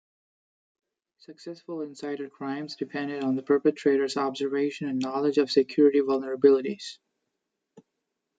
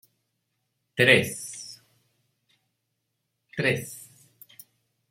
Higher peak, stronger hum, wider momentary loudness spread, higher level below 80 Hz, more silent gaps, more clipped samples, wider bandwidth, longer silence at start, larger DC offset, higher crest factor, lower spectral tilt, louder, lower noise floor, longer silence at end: second, -6 dBFS vs -2 dBFS; neither; second, 15 LU vs 22 LU; second, -80 dBFS vs -70 dBFS; neither; neither; second, 9 kHz vs 16.5 kHz; first, 1.3 s vs 0.95 s; neither; second, 20 dB vs 28 dB; first, -5.5 dB/octave vs -4 dB/octave; second, -26 LUFS vs -23 LUFS; first, -83 dBFS vs -79 dBFS; first, 1.45 s vs 1.1 s